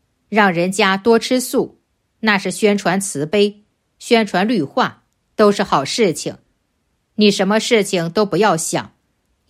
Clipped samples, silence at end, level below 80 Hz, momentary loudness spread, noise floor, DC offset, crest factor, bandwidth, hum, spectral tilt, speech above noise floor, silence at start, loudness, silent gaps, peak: under 0.1%; 0.65 s; -58 dBFS; 7 LU; -67 dBFS; under 0.1%; 16 dB; 15 kHz; none; -4 dB/octave; 51 dB; 0.3 s; -16 LUFS; none; 0 dBFS